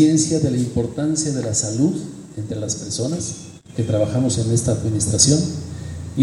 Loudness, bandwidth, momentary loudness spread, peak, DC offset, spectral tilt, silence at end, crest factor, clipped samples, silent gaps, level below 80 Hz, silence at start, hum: -20 LUFS; 12 kHz; 15 LU; 0 dBFS; under 0.1%; -5 dB/octave; 0 s; 20 dB; under 0.1%; none; -44 dBFS; 0 s; none